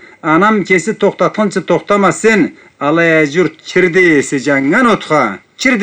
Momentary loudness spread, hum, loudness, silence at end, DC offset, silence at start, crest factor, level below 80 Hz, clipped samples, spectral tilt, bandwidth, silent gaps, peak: 6 LU; none; -12 LUFS; 0 s; under 0.1%; 0.25 s; 12 dB; -52 dBFS; under 0.1%; -5 dB/octave; 9.6 kHz; none; 0 dBFS